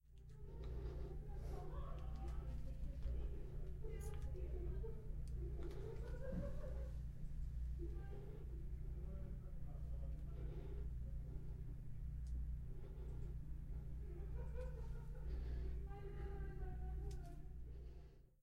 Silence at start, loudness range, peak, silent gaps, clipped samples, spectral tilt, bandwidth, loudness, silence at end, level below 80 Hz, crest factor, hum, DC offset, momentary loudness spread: 0.05 s; 2 LU; -34 dBFS; none; under 0.1%; -8 dB/octave; 11.5 kHz; -51 LUFS; 0.15 s; -48 dBFS; 12 dB; none; under 0.1%; 5 LU